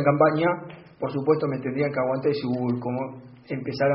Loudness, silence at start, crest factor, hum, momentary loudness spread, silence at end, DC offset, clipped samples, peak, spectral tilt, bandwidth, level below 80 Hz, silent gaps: -25 LUFS; 0 s; 18 dB; none; 14 LU; 0 s; under 0.1%; under 0.1%; -6 dBFS; -6.5 dB/octave; 5.8 kHz; -64 dBFS; none